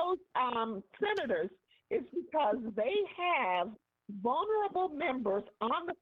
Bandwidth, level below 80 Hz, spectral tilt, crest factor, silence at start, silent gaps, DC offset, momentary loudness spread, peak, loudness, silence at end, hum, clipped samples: 7 kHz; -74 dBFS; -2 dB/octave; 14 dB; 0 s; none; under 0.1%; 6 LU; -20 dBFS; -34 LUFS; 0.05 s; none; under 0.1%